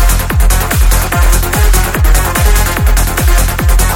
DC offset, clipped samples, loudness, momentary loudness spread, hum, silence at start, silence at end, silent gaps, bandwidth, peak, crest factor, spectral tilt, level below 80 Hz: under 0.1%; under 0.1%; -11 LUFS; 1 LU; none; 0 s; 0 s; none; 17.5 kHz; 0 dBFS; 8 dB; -4 dB/octave; -10 dBFS